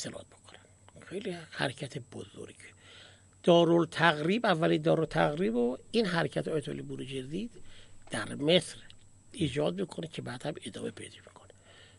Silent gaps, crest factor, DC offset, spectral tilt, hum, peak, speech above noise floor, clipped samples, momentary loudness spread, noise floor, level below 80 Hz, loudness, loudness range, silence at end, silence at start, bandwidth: none; 24 dB; under 0.1%; -5.5 dB/octave; none; -8 dBFS; 26 dB; under 0.1%; 21 LU; -56 dBFS; -60 dBFS; -30 LUFS; 10 LU; 0.7 s; 0 s; 11.5 kHz